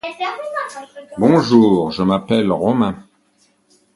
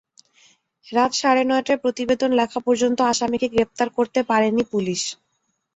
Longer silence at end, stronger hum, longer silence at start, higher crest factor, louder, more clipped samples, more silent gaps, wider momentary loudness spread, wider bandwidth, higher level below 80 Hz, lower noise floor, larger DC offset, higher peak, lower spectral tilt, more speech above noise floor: first, 0.95 s vs 0.6 s; neither; second, 0.05 s vs 0.85 s; about the same, 16 dB vs 18 dB; first, -16 LUFS vs -21 LUFS; neither; neither; first, 18 LU vs 5 LU; first, 11.5 kHz vs 8.2 kHz; first, -50 dBFS vs -58 dBFS; second, -59 dBFS vs -72 dBFS; neither; first, 0 dBFS vs -4 dBFS; first, -7 dB/octave vs -3.5 dB/octave; second, 43 dB vs 52 dB